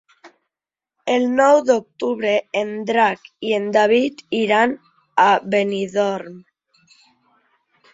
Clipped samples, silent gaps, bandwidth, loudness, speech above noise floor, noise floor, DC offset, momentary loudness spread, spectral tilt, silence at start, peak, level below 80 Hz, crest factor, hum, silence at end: under 0.1%; none; 7.8 kHz; -18 LUFS; 70 dB; -88 dBFS; under 0.1%; 10 LU; -4.5 dB/octave; 0.25 s; -2 dBFS; -66 dBFS; 18 dB; none; 1.55 s